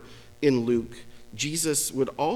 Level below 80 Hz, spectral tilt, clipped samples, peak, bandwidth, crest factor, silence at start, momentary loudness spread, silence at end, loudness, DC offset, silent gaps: -58 dBFS; -4 dB/octave; under 0.1%; -10 dBFS; 18 kHz; 18 dB; 0 s; 11 LU; 0 s; -26 LUFS; under 0.1%; none